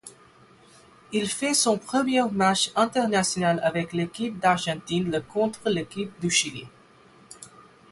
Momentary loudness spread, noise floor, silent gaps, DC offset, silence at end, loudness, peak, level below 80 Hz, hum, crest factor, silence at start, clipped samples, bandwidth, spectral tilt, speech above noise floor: 9 LU; -54 dBFS; none; under 0.1%; 0.3 s; -24 LUFS; -8 dBFS; -62 dBFS; none; 18 dB; 0.05 s; under 0.1%; 12 kHz; -3.5 dB/octave; 29 dB